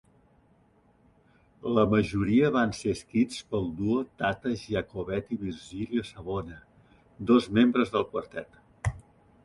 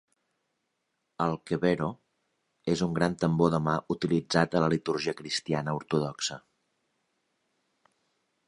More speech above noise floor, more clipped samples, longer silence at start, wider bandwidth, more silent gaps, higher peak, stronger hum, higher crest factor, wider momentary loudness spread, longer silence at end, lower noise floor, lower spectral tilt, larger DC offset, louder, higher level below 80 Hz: second, 36 dB vs 52 dB; neither; first, 1.65 s vs 1.2 s; about the same, 11.5 kHz vs 11 kHz; neither; about the same, -8 dBFS vs -8 dBFS; neither; about the same, 20 dB vs 24 dB; first, 12 LU vs 7 LU; second, 0.45 s vs 2.1 s; second, -63 dBFS vs -80 dBFS; about the same, -6.5 dB/octave vs -5.5 dB/octave; neither; about the same, -28 LUFS vs -29 LUFS; first, -50 dBFS vs -60 dBFS